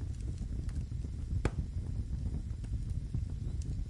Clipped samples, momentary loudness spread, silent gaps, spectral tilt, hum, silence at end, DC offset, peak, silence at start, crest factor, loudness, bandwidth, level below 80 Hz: under 0.1%; 4 LU; none; -7.5 dB/octave; none; 0 s; under 0.1%; -16 dBFS; 0 s; 20 dB; -39 LUFS; 11.5 kHz; -40 dBFS